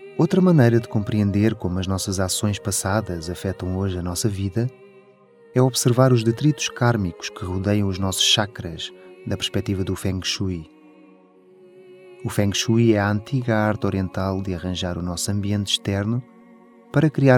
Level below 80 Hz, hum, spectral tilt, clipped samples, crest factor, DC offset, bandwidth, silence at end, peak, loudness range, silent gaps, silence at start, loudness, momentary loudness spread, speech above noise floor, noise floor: -50 dBFS; none; -5 dB/octave; under 0.1%; 20 dB; under 0.1%; 18 kHz; 0 s; -2 dBFS; 6 LU; none; 0 s; -22 LUFS; 11 LU; 31 dB; -51 dBFS